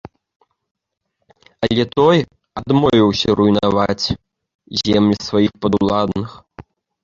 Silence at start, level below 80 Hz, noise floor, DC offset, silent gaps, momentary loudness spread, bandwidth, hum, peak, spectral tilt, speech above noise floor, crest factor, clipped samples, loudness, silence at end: 1.6 s; -44 dBFS; -73 dBFS; under 0.1%; 4.55-4.59 s; 11 LU; 7.6 kHz; none; 0 dBFS; -6.5 dB/octave; 58 dB; 16 dB; under 0.1%; -16 LUFS; 0.4 s